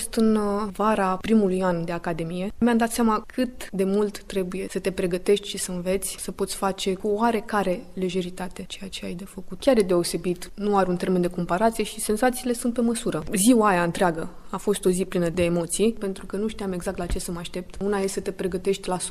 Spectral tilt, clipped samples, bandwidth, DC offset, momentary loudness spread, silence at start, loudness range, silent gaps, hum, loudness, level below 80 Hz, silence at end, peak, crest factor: -5 dB/octave; under 0.1%; 15 kHz; under 0.1%; 9 LU; 0 s; 4 LU; none; none; -25 LUFS; -44 dBFS; 0 s; -6 dBFS; 18 dB